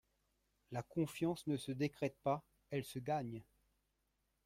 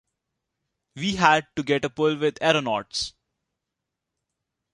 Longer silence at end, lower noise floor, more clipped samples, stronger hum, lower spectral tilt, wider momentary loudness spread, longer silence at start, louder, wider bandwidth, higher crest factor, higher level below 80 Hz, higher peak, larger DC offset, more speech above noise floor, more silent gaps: second, 1.05 s vs 1.65 s; about the same, -84 dBFS vs -84 dBFS; neither; first, 50 Hz at -65 dBFS vs none; first, -6.5 dB/octave vs -4 dB/octave; about the same, 9 LU vs 10 LU; second, 0.7 s vs 0.95 s; second, -42 LUFS vs -23 LUFS; first, 16 kHz vs 11 kHz; about the same, 20 dB vs 24 dB; second, -74 dBFS vs -58 dBFS; second, -24 dBFS vs -2 dBFS; neither; second, 43 dB vs 61 dB; neither